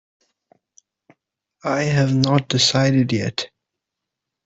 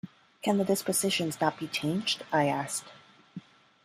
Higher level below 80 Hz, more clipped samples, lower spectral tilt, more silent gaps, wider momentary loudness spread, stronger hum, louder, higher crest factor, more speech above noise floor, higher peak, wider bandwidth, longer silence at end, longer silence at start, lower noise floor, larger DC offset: first, -56 dBFS vs -72 dBFS; neither; first, -5 dB/octave vs -3.5 dB/octave; neither; second, 13 LU vs 21 LU; neither; first, -19 LUFS vs -29 LUFS; about the same, 18 dB vs 20 dB; first, 65 dB vs 19 dB; first, -4 dBFS vs -12 dBFS; second, 8.2 kHz vs 15.5 kHz; first, 1 s vs 0.45 s; first, 1.65 s vs 0.05 s; first, -83 dBFS vs -48 dBFS; neither